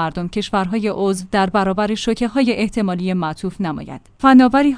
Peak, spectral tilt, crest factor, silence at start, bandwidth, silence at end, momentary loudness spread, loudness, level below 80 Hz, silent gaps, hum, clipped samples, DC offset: 0 dBFS; -6 dB/octave; 16 dB; 0 s; 10.5 kHz; 0 s; 13 LU; -17 LUFS; -42 dBFS; none; none; under 0.1%; under 0.1%